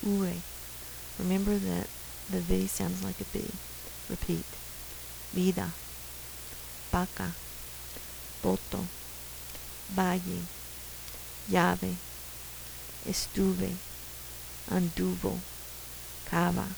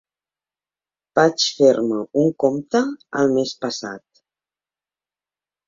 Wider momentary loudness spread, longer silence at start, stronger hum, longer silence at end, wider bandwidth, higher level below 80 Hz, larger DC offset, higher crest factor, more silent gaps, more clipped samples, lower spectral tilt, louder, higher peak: about the same, 11 LU vs 11 LU; second, 0 s vs 1.15 s; neither; second, 0 s vs 1.7 s; first, over 20 kHz vs 7.6 kHz; first, -48 dBFS vs -64 dBFS; neither; about the same, 24 dB vs 20 dB; neither; neither; about the same, -5 dB/octave vs -4.5 dB/octave; second, -34 LUFS vs -19 LUFS; second, -8 dBFS vs -2 dBFS